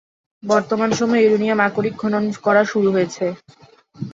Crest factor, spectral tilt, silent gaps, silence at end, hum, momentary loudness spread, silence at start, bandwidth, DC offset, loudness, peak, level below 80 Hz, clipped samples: 16 dB; -5.5 dB/octave; none; 0 s; none; 10 LU; 0.45 s; 7.8 kHz; under 0.1%; -18 LUFS; -2 dBFS; -60 dBFS; under 0.1%